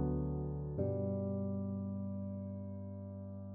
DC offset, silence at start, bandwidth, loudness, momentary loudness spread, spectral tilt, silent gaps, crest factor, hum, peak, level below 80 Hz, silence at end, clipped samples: under 0.1%; 0 s; 2.3 kHz; -41 LUFS; 9 LU; -14.5 dB/octave; none; 14 dB; none; -26 dBFS; -52 dBFS; 0 s; under 0.1%